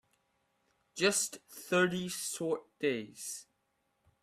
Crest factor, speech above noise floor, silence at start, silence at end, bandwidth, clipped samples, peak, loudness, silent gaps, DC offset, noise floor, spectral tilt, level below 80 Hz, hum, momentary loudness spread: 22 dB; 45 dB; 0.95 s; 0.8 s; 16 kHz; under 0.1%; -14 dBFS; -33 LUFS; none; under 0.1%; -79 dBFS; -3 dB/octave; -76 dBFS; none; 14 LU